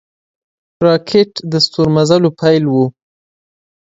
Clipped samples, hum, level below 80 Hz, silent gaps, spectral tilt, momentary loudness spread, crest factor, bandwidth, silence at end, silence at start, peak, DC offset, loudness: under 0.1%; none; -50 dBFS; none; -6 dB/octave; 5 LU; 14 dB; 8 kHz; 0.95 s; 0.8 s; 0 dBFS; under 0.1%; -13 LUFS